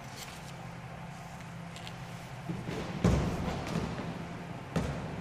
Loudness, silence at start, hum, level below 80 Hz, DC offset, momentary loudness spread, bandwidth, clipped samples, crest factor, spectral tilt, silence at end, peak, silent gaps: -37 LUFS; 0 s; none; -46 dBFS; under 0.1%; 14 LU; 15.5 kHz; under 0.1%; 22 dB; -6 dB/octave; 0 s; -14 dBFS; none